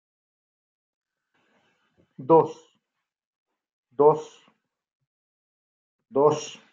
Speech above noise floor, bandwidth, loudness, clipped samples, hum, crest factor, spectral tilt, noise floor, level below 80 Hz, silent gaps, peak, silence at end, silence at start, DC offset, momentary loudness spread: 62 dB; 7.6 kHz; -22 LUFS; under 0.1%; none; 22 dB; -6.5 dB/octave; -83 dBFS; -76 dBFS; 3.25-3.46 s, 3.73-3.83 s, 4.92-5.00 s, 5.07-5.99 s; -6 dBFS; 0.2 s; 2.2 s; under 0.1%; 14 LU